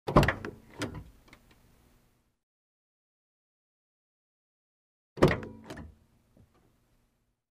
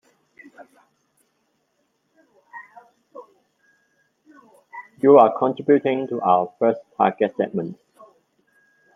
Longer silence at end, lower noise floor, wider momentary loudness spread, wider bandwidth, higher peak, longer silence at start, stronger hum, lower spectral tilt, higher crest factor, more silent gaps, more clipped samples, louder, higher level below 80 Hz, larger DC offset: first, 1.65 s vs 1.2 s; first, -74 dBFS vs -70 dBFS; second, 23 LU vs 28 LU; first, 15.5 kHz vs 3.8 kHz; second, -6 dBFS vs -2 dBFS; second, 0.05 s vs 0.6 s; neither; second, -6.5 dB/octave vs -8.5 dB/octave; first, 28 dB vs 22 dB; first, 2.43-5.16 s vs none; neither; second, -29 LUFS vs -19 LUFS; first, -46 dBFS vs -74 dBFS; neither